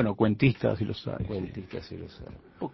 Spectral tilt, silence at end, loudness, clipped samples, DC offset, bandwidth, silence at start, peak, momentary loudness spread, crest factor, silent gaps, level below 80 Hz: -9 dB/octave; 0 s; -29 LUFS; under 0.1%; under 0.1%; 6 kHz; 0 s; -8 dBFS; 20 LU; 20 dB; none; -50 dBFS